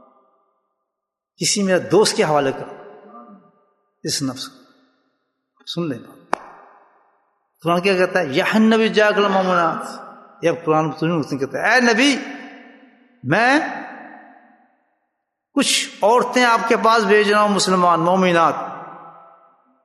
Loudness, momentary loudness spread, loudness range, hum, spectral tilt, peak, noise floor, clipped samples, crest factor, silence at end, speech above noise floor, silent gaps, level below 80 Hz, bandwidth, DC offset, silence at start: -17 LUFS; 18 LU; 13 LU; none; -4 dB/octave; 0 dBFS; -82 dBFS; under 0.1%; 20 dB; 0.75 s; 65 dB; none; -66 dBFS; 12.5 kHz; under 0.1%; 1.4 s